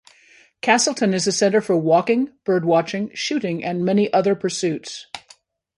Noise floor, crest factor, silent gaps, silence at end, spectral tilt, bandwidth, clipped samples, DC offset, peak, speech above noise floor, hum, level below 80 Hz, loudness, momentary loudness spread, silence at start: -53 dBFS; 18 dB; none; 0.6 s; -4.5 dB/octave; 11.5 kHz; under 0.1%; under 0.1%; -2 dBFS; 34 dB; none; -66 dBFS; -20 LUFS; 10 LU; 0.65 s